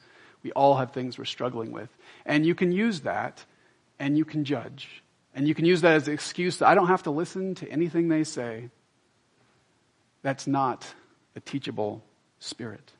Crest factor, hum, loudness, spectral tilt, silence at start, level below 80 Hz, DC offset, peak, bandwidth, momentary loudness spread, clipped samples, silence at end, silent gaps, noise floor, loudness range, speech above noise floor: 24 dB; none; -26 LUFS; -6 dB/octave; 0.45 s; -74 dBFS; under 0.1%; -4 dBFS; 11 kHz; 20 LU; under 0.1%; 0.2 s; none; -67 dBFS; 9 LU; 41 dB